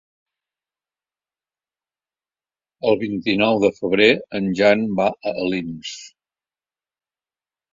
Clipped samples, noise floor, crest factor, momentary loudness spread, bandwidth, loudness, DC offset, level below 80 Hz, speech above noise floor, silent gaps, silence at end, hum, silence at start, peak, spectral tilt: under 0.1%; under -90 dBFS; 22 dB; 13 LU; 7.6 kHz; -19 LUFS; under 0.1%; -58 dBFS; over 71 dB; none; 1.65 s; none; 2.85 s; -2 dBFS; -5.5 dB/octave